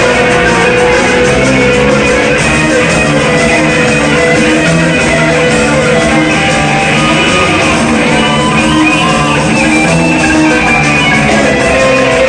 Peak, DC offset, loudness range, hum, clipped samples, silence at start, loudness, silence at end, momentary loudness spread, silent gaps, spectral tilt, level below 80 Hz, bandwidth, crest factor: 0 dBFS; 0.5%; 0 LU; none; 0.3%; 0 s; -7 LUFS; 0 s; 1 LU; none; -4.5 dB/octave; -26 dBFS; 9.8 kHz; 8 dB